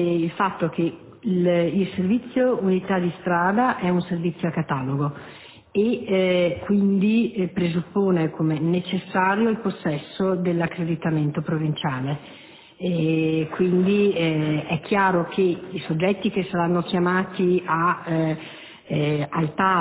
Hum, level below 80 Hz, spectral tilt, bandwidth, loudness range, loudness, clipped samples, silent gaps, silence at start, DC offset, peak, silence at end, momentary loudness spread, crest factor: none; -56 dBFS; -11.5 dB/octave; 4 kHz; 2 LU; -23 LUFS; under 0.1%; none; 0 s; under 0.1%; -6 dBFS; 0 s; 7 LU; 16 dB